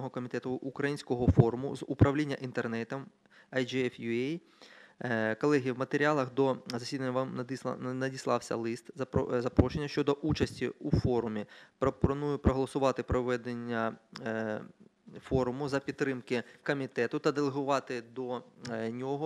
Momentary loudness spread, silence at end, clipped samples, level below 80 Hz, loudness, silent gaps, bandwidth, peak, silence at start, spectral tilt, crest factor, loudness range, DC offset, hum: 10 LU; 0 s; under 0.1%; -50 dBFS; -32 LUFS; none; 12.5 kHz; -8 dBFS; 0 s; -7 dB/octave; 24 dB; 3 LU; under 0.1%; none